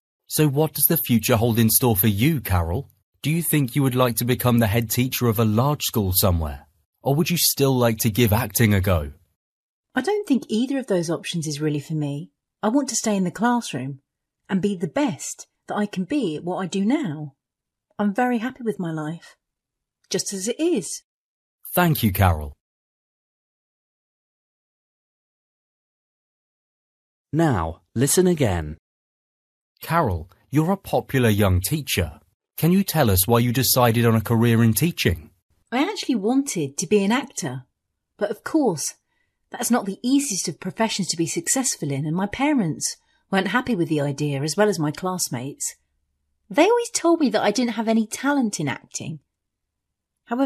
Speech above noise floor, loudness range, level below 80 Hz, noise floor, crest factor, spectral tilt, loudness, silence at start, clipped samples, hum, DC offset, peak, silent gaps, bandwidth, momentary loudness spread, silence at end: 64 dB; 6 LU; -46 dBFS; -85 dBFS; 22 dB; -5 dB/octave; -22 LUFS; 0.3 s; under 0.1%; none; under 0.1%; 0 dBFS; 3.03-3.13 s, 6.85-6.93 s, 9.36-9.84 s, 21.04-21.59 s, 22.61-27.25 s, 28.79-29.75 s, 32.34-32.40 s, 35.42-35.49 s; 14 kHz; 12 LU; 0 s